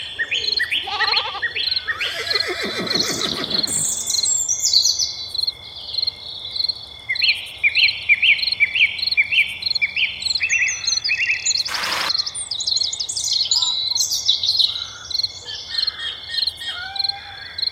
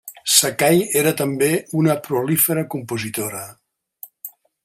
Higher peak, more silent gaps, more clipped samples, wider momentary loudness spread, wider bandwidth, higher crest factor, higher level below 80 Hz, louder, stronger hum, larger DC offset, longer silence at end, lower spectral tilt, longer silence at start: about the same, -2 dBFS vs 0 dBFS; neither; neither; second, 9 LU vs 20 LU; about the same, 16 kHz vs 16.5 kHz; about the same, 20 dB vs 20 dB; first, -54 dBFS vs -62 dBFS; about the same, -18 LUFS vs -18 LUFS; neither; neither; second, 0 s vs 0.35 s; second, 1 dB/octave vs -3.5 dB/octave; about the same, 0 s vs 0.05 s